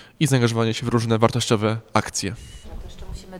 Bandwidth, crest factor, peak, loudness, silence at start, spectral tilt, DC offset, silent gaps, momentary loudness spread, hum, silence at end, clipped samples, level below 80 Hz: 15 kHz; 20 dB; -2 dBFS; -21 LUFS; 0 s; -5 dB/octave; under 0.1%; none; 20 LU; none; 0 s; under 0.1%; -42 dBFS